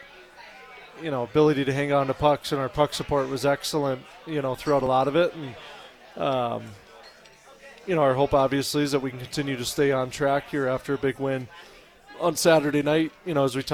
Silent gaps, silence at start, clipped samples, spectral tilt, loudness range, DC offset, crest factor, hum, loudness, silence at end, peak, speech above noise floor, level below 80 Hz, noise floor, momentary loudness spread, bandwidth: none; 0 s; under 0.1%; -5 dB/octave; 3 LU; under 0.1%; 20 dB; none; -25 LUFS; 0 s; -6 dBFS; 27 dB; -52 dBFS; -51 dBFS; 17 LU; 18.5 kHz